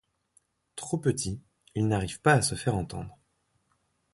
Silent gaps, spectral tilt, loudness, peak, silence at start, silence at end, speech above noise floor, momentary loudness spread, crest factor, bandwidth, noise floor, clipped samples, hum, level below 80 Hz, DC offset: none; -5 dB/octave; -28 LUFS; -8 dBFS; 0.75 s; 1 s; 46 dB; 18 LU; 22 dB; 11.5 kHz; -73 dBFS; under 0.1%; none; -52 dBFS; under 0.1%